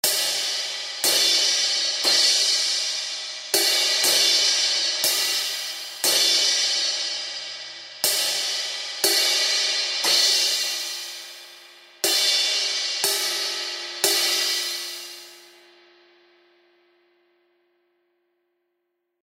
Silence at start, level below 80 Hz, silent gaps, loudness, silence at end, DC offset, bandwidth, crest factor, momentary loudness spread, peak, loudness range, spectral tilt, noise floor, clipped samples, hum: 0.05 s; -86 dBFS; none; -20 LUFS; 3.85 s; under 0.1%; 16.5 kHz; 22 dB; 13 LU; -2 dBFS; 6 LU; 2.5 dB/octave; -77 dBFS; under 0.1%; none